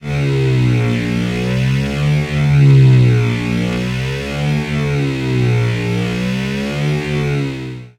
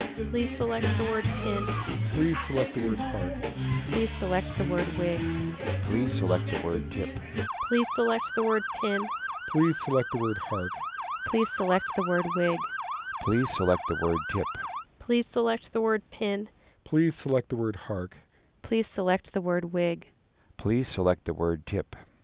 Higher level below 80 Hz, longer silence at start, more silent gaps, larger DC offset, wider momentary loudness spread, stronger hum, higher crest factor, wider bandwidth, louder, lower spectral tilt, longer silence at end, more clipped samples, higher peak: first, -34 dBFS vs -46 dBFS; about the same, 0 s vs 0 s; neither; neither; about the same, 9 LU vs 8 LU; neither; about the same, 14 dB vs 18 dB; first, 11 kHz vs 4 kHz; first, -15 LUFS vs -29 LUFS; second, -7 dB/octave vs -11 dB/octave; about the same, 0.1 s vs 0.2 s; neither; first, -2 dBFS vs -10 dBFS